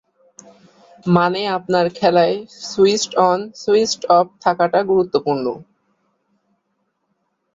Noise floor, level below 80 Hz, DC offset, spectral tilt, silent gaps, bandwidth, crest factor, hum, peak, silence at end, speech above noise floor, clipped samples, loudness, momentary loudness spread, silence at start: -70 dBFS; -60 dBFS; under 0.1%; -5 dB/octave; none; 7.8 kHz; 18 dB; none; -2 dBFS; 1.95 s; 53 dB; under 0.1%; -17 LUFS; 8 LU; 1.05 s